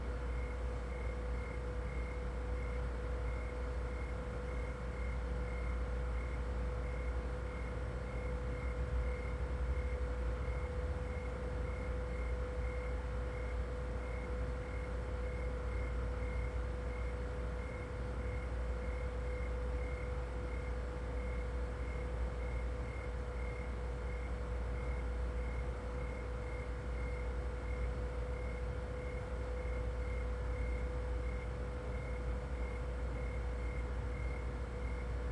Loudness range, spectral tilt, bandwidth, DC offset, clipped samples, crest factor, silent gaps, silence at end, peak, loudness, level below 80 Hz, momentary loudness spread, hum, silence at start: 1 LU; -7 dB/octave; 9.8 kHz; under 0.1%; under 0.1%; 12 dB; none; 0 s; -26 dBFS; -42 LUFS; -40 dBFS; 2 LU; none; 0 s